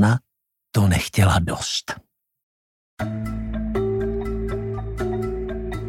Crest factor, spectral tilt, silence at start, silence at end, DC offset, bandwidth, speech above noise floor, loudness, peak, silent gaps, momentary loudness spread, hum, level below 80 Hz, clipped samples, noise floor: 20 dB; -5.5 dB/octave; 0 s; 0 s; under 0.1%; 16 kHz; 58 dB; -24 LUFS; -4 dBFS; 2.43-2.97 s; 10 LU; none; -34 dBFS; under 0.1%; -78 dBFS